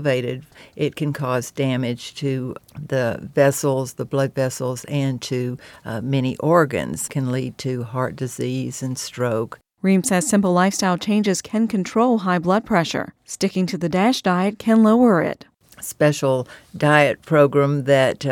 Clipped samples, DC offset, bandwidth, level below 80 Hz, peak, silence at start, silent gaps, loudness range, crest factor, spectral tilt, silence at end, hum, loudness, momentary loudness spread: under 0.1%; under 0.1%; 17.5 kHz; -58 dBFS; 0 dBFS; 0 s; none; 5 LU; 20 dB; -5.5 dB/octave; 0 s; none; -20 LUFS; 11 LU